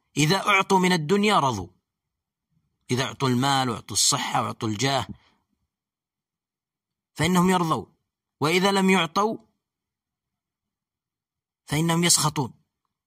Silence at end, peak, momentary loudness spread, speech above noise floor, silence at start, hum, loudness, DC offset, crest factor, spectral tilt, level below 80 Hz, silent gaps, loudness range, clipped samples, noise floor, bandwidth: 0.6 s; -4 dBFS; 10 LU; over 68 dB; 0.15 s; none; -22 LUFS; under 0.1%; 20 dB; -3.5 dB/octave; -58 dBFS; none; 4 LU; under 0.1%; under -90 dBFS; 15.5 kHz